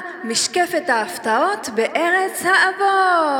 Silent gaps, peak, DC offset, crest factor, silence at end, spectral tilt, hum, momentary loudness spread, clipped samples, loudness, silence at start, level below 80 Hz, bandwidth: none; -4 dBFS; under 0.1%; 16 dB; 0 s; -1.5 dB/octave; none; 5 LU; under 0.1%; -18 LUFS; 0 s; -70 dBFS; 20 kHz